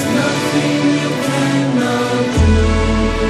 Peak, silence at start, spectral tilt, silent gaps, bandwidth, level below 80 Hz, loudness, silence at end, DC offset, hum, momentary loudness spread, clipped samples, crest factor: -2 dBFS; 0 s; -5.5 dB/octave; none; 14 kHz; -22 dBFS; -15 LUFS; 0 s; under 0.1%; none; 3 LU; under 0.1%; 12 dB